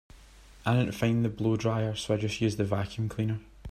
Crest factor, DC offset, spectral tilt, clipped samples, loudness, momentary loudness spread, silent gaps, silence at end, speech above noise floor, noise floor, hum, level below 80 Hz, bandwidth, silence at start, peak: 18 dB; under 0.1%; -6.5 dB/octave; under 0.1%; -30 LUFS; 6 LU; none; 0 s; 24 dB; -53 dBFS; none; -52 dBFS; 14 kHz; 0.15 s; -12 dBFS